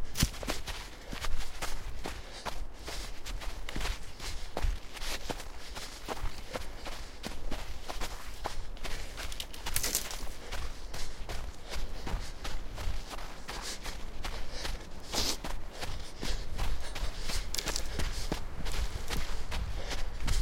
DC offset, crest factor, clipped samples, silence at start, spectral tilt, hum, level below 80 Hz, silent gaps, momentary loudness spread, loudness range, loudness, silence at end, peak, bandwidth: under 0.1%; 22 dB; under 0.1%; 0 s; -3 dB/octave; none; -38 dBFS; none; 9 LU; 4 LU; -39 LUFS; 0 s; -10 dBFS; 16.5 kHz